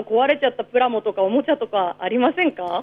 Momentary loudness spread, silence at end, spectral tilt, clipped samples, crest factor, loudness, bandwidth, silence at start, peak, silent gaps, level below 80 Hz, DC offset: 4 LU; 0 s; -7 dB/octave; under 0.1%; 14 dB; -20 LUFS; 5 kHz; 0 s; -6 dBFS; none; -66 dBFS; under 0.1%